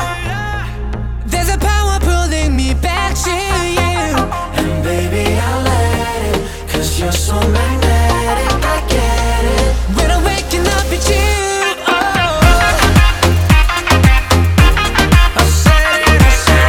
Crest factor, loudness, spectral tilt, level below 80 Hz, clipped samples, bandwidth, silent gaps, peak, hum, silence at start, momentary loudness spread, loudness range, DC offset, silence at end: 12 dB; -13 LUFS; -4.5 dB/octave; -16 dBFS; under 0.1%; 18 kHz; none; 0 dBFS; none; 0 s; 8 LU; 5 LU; under 0.1%; 0 s